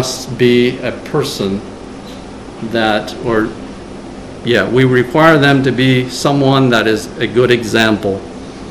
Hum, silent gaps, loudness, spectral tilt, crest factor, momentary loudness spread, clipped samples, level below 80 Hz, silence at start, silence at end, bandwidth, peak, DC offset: none; none; -13 LUFS; -5.5 dB/octave; 14 dB; 20 LU; 0.3%; -40 dBFS; 0 s; 0 s; 14 kHz; 0 dBFS; 0.3%